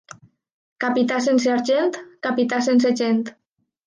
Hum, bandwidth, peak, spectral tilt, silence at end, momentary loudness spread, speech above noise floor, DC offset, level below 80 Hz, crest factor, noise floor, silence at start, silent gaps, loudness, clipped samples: none; 9.6 kHz; -8 dBFS; -4.5 dB/octave; 0.55 s; 8 LU; 27 dB; under 0.1%; -74 dBFS; 14 dB; -46 dBFS; 0.8 s; none; -20 LUFS; under 0.1%